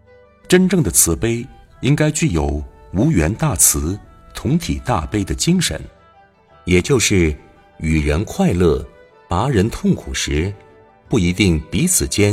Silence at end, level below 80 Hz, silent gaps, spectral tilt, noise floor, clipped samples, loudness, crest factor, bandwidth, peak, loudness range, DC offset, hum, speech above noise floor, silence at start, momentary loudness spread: 0 s; -30 dBFS; none; -4.5 dB/octave; -50 dBFS; under 0.1%; -17 LUFS; 18 dB; 16.5 kHz; 0 dBFS; 3 LU; under 0.1%; none; 33 dB; 0.5 s; 13 LU